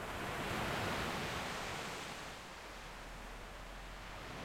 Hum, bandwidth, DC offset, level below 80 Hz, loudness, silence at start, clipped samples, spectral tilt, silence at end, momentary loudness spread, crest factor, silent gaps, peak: none; 16 kHz; under 0.1%; -54 dBFS; -43 LUFS; 0 s; under 0.1%; -3.5 dB/octave; 0 s; 12 LU; 16 dB; none; -28 dBFS